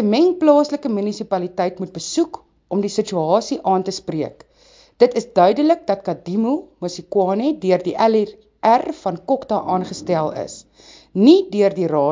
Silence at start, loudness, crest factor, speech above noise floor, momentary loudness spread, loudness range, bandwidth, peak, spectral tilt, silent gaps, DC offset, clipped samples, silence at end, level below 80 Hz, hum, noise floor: 0 s; -19 LUFS; 18 dB; 33 dB; 12 LU; 3 LU; 7.6 kHz; 0 dBFS; -6 dB/octave; none; under 0.1%; under 0.1%; 0 s; -60 dBFS; none; -51 dBFS